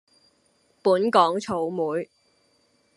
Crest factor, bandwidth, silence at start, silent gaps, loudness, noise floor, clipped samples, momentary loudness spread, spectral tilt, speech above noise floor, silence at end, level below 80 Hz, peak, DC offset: 22 dB; 11.5 kHz; 0.85 s; none; -23 LUFS; -65 dBFS; under 0.1%; 11 LU; -5.5 dB/octave; 43 dB; 0.9 s; -72 dBFS; -4 dBFS; under 0.1%